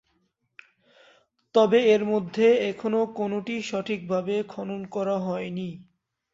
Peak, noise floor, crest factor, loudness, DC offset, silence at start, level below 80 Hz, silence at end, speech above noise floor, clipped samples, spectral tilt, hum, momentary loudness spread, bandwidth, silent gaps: -8 dBFS; -72 dBFS; 18 dB; -25 LUFS; under 0.1%; 1.55 s; -70 dBFS; 0.5 s; 48 dB; under 0.1%; -6 dB/octave; none; 13 LU; 7.8 kHz; none